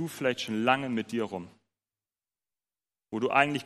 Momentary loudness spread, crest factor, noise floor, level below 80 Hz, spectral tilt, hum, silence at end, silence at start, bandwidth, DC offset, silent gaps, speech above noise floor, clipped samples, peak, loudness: 12 LU; 24 dB; under -90 dBFS; -76 dBFS; -5 dB/octave; none; 0 s; 0 s; 15 kHz; under 0.1%; none; over 61 dB; under 0.1%; -8 dBFS; -29 LUFS